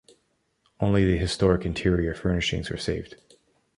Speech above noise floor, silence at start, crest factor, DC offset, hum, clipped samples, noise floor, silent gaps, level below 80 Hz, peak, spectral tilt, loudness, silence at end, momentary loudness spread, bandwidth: 47 dB; 0.8 s; 20 dB; under 0.1%; none; under 0.1%; -71 dBFS; none; -38 dBFS; -6 dBFS; -6 dB/octave; -25 LUFS; 0.65 s; 8 LU; 11 kHz